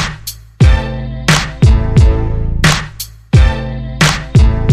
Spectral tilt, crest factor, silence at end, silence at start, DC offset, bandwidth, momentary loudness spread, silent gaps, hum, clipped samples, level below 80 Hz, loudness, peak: -5 dB/octave; 10 dB; 0 s; 0 s; under 0.1%; 14.5 kHz; 12 LU; none; none; under 0.1%; -14 dBFS; -12 LUFS; 0 dBFS